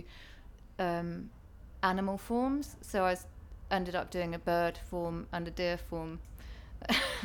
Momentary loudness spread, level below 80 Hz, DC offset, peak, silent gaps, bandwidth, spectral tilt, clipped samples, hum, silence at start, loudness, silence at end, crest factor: 19 LU; -50 dBFS; under 0.1%; -14 dBFS; none; 19 kHz; -5 dB/octave; under 0.1%; none; 0 s; -35 LUFS; 0 s; 20 dB